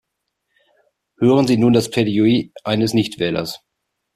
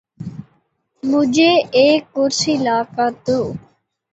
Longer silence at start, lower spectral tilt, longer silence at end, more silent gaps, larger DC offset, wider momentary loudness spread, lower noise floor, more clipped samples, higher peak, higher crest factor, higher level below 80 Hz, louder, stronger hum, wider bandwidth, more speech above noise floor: first, 1.2 s vs 0.2 s; first, -6 dB/octave vs -4 dB/octave; about the same, 0.6 s vs 0.55 s; neither; neither; second, 9 LU vs 19 LU; first, -76 dBFS vs -63 dBFS; neither; about the same, -2 dBFS vs -2 dBFS; about the same, 16 dB vs 14 dB; about the same, -54 dBFS vs -56 dBFS; about the same, -17 LUFS vs -16 LUFS; neither; first, 14 kHz vs 8.2 kHz; first, 60 dB vs 47 dB